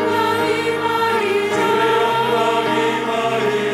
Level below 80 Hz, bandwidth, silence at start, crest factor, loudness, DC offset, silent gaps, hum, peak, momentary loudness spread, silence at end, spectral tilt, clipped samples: -60 dBFS; 16 kHz; 0 s; 12 dB; -17 LUFS; under 0.1%; none; none; -6 dBFS; 3 LU; 0 s; -4 dB/octave; under 0.1%